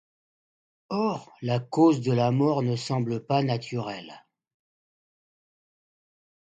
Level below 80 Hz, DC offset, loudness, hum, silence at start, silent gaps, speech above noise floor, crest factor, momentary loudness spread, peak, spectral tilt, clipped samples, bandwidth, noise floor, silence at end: -70 dBFS; under 0.1%; -26 LUFS; none; 0.9 s; none; over 65 dB; 18 dB; 12 LU; -10 dBFS; -7.5 dB/octave; under 0.1%; 9 kHz; under -90 dBFS; 2.3 s